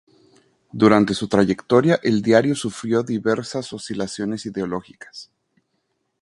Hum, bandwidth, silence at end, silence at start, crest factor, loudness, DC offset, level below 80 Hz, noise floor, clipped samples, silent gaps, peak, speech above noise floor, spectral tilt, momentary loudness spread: none; 11.5 kHz; 1 s; 0.75 s; 22 dB; -20 LUFS; under 0.1%; -56 dBFS; -72 dBFS; under 0.1%; none; 0 dBFS; 52 dB; -6 dB/octave; 17 LU